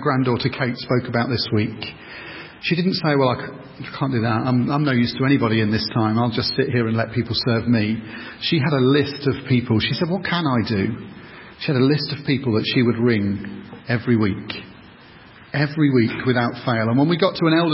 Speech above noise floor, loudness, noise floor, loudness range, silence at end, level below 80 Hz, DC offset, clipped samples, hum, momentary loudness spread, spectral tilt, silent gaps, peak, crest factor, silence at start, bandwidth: 25 dB; -20 LUFS; -45 dBFS; 3 LU; 0 s; -48 dBFS; under 0.1%; under 0.1%; none; 14 LU; -10.5 dB/octave; none; -4 dBFS; 18 dB; 0 s; 5.8 kHz